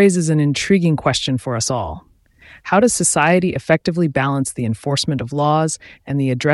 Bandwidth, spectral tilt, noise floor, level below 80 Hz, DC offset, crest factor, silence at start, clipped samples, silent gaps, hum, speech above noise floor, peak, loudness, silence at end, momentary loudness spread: 12 kHz; -5 dB/octave; -46 dBFS; -46 dBFS; under 0.1%; 16 dB; 0 s; under 0.1%; none; none; 29 dB; -2 dBFS; -17 LUFS; 0 s; 9 LU